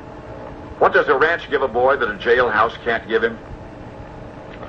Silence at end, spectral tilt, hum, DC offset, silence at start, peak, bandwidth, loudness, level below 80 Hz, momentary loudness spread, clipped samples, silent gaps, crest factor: 0 s; -6 dB/octave; none; under 0.1%; 0 s; -4 dBFS; 7 kHz; -18 LUFS; -44 dBFS; 21 LU; under 0.1%; none; 16 dB